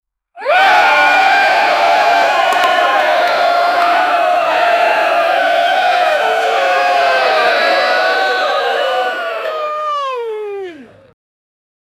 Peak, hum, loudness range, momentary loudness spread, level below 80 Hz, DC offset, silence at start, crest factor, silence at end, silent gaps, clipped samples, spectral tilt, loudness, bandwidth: 0 dBFS; none; 6 LU; 10 LU; -62 dBFS; under 0.1%; 0.35 s; 12 dB; 1.15 s; none; under 0.1%; -1 dB/octave; -12 LUFS; 15.5 kHz